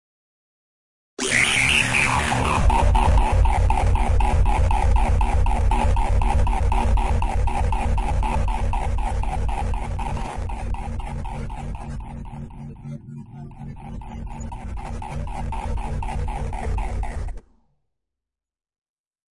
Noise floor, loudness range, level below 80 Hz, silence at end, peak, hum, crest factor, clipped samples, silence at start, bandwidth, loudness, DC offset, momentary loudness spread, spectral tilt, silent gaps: under -90 dBFS; 15 LU; -24 dBFS; 1.95 s; -4 dBFS; none; 16 dB; under 0.1%; 1.2 s; 11.5 kHz; -23 LUFS; under 0.1%; 17 LU; -4.5 dB/octave; none